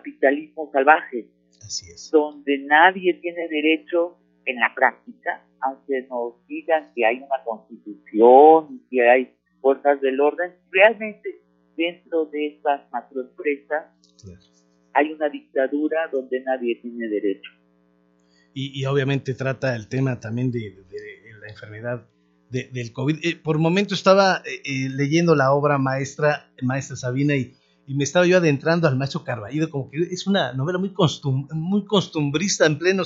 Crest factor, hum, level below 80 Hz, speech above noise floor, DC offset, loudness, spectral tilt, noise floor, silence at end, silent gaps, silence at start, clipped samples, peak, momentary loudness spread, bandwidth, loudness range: 22 dB; none; -68 dBFS; 40 dB; under 0.1%; -21 LUFS; -5.5 dB/octave; -61 dBFS; 0 s; none; 0.05 s; under 0.1%; 0 dBFS; 15 LU; 7.8 kHz; 10 LU